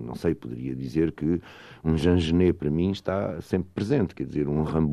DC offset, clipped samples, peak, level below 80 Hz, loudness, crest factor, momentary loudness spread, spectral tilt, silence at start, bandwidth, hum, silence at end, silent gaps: under 0.1%; under 0.1%; -10 dBFS; -46 dBFS; -26 LUFS; 16 dB; 9 LU; -8 dB/octave; 0 s; 12.5 kHz; none; 0 s; none